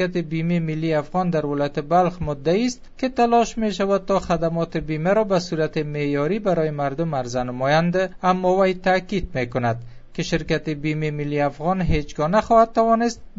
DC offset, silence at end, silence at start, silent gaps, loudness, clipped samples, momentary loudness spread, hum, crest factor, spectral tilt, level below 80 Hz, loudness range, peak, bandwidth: under 0.1%; 0.1 s; 0 s; none; -21 LUFS; under 0.1%; 7 LU; none; 18 dB; -6.5 dB/octave; -40 dBFS; 2 LU; -4 dBFS; 8 kHz